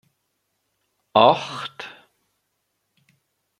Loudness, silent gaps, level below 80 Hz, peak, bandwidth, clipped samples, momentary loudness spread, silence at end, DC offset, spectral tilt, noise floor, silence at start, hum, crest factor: -19 LUFS; none; -70 dBFS; -2 dBFS; 11.5 kHz; under 0.1%; 22 LU; 1.7 s; under 0.1%; -5 dB/octave; -75 dBFS; 1.15 s; none; 24 dB